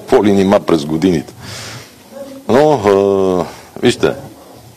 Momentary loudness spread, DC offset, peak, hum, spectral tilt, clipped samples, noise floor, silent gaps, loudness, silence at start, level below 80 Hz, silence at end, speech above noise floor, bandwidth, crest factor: 19 LU; under 0.1%; 0 dBFS; none; -6 dB/octave; under 0.1%; -33 dBFS; none; -13 LUFS; 0 s; -48 dBFS; 0.5 s; 20 dB; 15 kHz; 14 dB